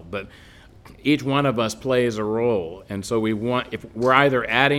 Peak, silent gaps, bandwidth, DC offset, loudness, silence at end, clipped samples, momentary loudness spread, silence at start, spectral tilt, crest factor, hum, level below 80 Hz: 0 dBFS; none; 16.5 kHz; under 0.1%; -22 LUFS; 0 s; under 0.1%; 15 LU; 0 s; -5.5 dB/octave; 22 dB; none; -52 dBFS